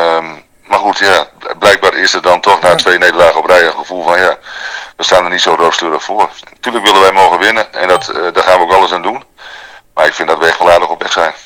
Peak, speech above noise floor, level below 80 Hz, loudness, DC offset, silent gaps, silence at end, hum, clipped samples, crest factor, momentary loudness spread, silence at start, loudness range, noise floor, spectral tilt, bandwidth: 0 dBFS; 23 dB; -46 dBFS; -9 LUFS; under 0.1%; none; 0.05 s; none; 4%; 10 dB; 13 LU; 0 s; 3 LU; -33 dBFS; -2 dB/octave; over 20 kHz